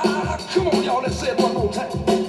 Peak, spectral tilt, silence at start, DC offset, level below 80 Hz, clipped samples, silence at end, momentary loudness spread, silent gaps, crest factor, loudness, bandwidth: -6 dBFS; -5.5 dB/octave; 0 s; under 0.1%; -42 dBFS; under 0.1%; 0 s; 4 LU; none; 14 dB; -21 LUFS; 12.5 kHz